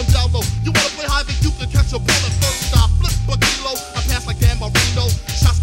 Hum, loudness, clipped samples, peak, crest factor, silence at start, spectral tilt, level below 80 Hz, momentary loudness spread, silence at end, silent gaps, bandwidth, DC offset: none; -17 LUFS; under 0.1%; 0 dBFS; 16 dB; 0 s; -3.5 dB/octave; -22 dBFS; 5 LU; 0 s; none; 17.5 kHz; under 0.1%